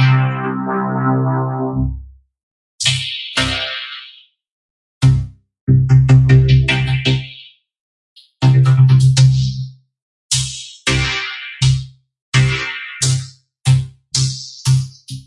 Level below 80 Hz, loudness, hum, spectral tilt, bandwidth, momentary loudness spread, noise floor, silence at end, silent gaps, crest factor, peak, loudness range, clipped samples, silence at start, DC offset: -32 dBFS; -15 LUFS; none; -5 dB/octave; 11.5 kHz; 14 LU; -44 dBFS; 0.05 s; 2.43-2.79 s, 4.52-5.01 s, 5.61-5.67 s, 7.80-8.16 s, 10.02-10.29 s, 12.22-12.32 s; 14 dB; 0 dBFS; 6 LU; under 0.1%; 0 s; under 0.1%